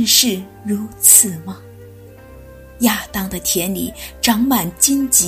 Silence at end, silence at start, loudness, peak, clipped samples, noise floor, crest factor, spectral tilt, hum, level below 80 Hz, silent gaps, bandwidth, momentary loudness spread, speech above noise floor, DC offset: 0 s; 0 s; -14 LUFS; 0 dBFS; under 0.1%; -39 dBFS; 18 dB; -2 dB/octave; none; -42 dBFS; none; 16 kHz; 18 LU; 23 dB; under 0.1%